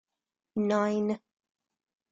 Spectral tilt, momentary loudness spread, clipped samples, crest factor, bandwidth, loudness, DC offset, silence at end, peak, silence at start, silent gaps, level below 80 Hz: -7 dB/octave; 11 LU; under 0.1%; 16 dB; 7.6 kHz; -30 LUFS; under 0.1%; 0.95 s; -16 dBFS; 0.55 s; none; -74 dBFS